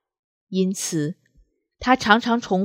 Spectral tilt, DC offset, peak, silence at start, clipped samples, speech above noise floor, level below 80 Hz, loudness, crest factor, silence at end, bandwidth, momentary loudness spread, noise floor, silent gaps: -4.5 dB/octave; under 0.1%; -2 dBFS; 0.5 s; under 0.1%; 40 dB; -54 dBFS; -21 LUFS; 22 dB; 0 s; 16 kHz; 12 LU; -60 dBFS; none